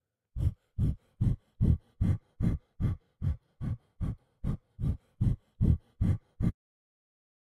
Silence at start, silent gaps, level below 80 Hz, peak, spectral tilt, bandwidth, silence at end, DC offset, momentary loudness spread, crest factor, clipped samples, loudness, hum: 0.35 s; none; -38 dBFS; -12 dBFS; -10 dB/octave; 9 kHz; 1 s; under 0.1%; 9 LU; 20 dB; under 0.1%; -33 LUFS; none